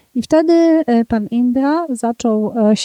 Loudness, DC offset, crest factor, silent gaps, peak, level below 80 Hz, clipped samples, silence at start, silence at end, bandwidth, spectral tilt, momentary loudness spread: -15 LUFS; under 0.1%; 12 dB; none; -2 dBFS; -48 dBFS; under 0.1%; 0.15 s; 0 s; 12 kHz; -6 dB/octave; 6 LU